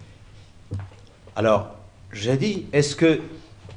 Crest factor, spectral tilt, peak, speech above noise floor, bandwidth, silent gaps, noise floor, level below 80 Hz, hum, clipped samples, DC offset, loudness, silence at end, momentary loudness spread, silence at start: 20 dB; -5.5 dB/octave; -6 dBFS; 25 dB; 10.5 kHz; none; -46 dBFS; -52 dBFS; none; under 0.1%; under 0.1%; -22 LUFS; 0 s; 20 LU; 0 s